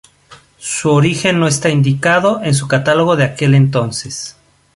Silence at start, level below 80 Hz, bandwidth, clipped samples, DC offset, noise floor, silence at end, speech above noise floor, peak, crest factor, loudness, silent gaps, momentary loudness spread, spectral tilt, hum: 0.3 s; -50 dBFS; 11.5 kHz; under 0.1%; under 0.1%; -44 dBFS; 0.45 s; 31 dB; -2 dBFS; 12 dB; -13 LUFS; none; 11 LU; -5 dB/octave; none